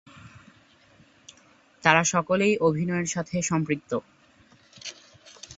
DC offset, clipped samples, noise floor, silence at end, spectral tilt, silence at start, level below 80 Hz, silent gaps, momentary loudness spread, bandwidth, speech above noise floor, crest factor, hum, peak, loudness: under 0.1%; under 0.1%; -58 dBFS; 0.05 s; -4.5 dB/octave; 0.15 s; -62 dBFS; none; 19 LU; 8 kHz; 34 dB; 26 dB; none; -2 dBFS; -24 LUFS